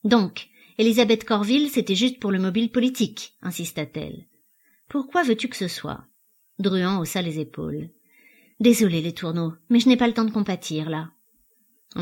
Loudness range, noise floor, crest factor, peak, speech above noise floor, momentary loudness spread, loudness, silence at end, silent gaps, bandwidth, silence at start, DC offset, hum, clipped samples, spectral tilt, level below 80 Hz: 6 LU; -63 dBFS; 20 dB; -4 dBFS; 41 dB; 16 LU; -23 LUFS; 0 s; none; 17 kHz; 0.05 s; under 0.1%; none; under 0.1%; -5 dB/octave; -60 dBFS